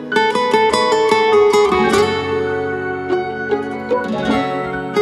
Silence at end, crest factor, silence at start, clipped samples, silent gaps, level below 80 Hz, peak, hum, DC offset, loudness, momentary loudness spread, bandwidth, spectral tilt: 0 s; 14 dB; 0 s; under 0.1%; none; -46 dBFS; 0 dBFS; none; under 0.1%; -16 LUFS; 8 LU; 12.5 kHz; -4.5 dB/octave